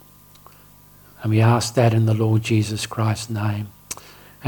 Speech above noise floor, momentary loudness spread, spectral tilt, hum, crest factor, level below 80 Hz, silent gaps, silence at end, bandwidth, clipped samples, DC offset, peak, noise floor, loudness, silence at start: 30 dB; 15 LU; -6 dB/octave; 50 Hz at -50 dBFS; 18 dB; -54 dBFS; none; 0 s; 19 kHz; under 0.1%; under 0.1%; -2 dBFS; -48 dBFS; -20 LUFS; 1.2 s